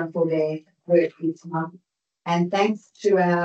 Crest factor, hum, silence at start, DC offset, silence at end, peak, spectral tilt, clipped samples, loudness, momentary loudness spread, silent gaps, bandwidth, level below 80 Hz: 16 dB; none; 0 s; under 0.1%; 0 s; -6 dBFS; -7 dB/octave; under 0.1%; -23 LUFS; 10 LU; none; 8 kHz; -78 dBFS